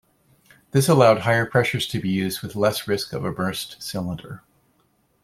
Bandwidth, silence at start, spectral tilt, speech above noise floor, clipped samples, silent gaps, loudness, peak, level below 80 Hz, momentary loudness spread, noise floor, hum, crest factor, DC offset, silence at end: 16.5 kHz; 0.75 s; -5 dB/octave; 43 dB; under 0.1%; none; -22 LUFS; -2 dBFS; -56 dBFS; 14 LU; -65 dBFS; none; 20 dB; under 0.1%; 0.85 s